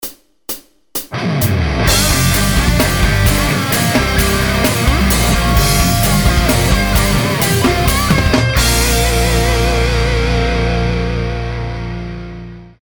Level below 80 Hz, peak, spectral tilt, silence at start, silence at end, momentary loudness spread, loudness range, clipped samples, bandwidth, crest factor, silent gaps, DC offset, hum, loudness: -18 dBFS; 0 dBFS; -4 dB/octave; 0 s; 0.15 s; 12 LU; 2 LU; under 0.1%; over 20 kHz; 14 dB; none; 0.3%; none; -13 LUFS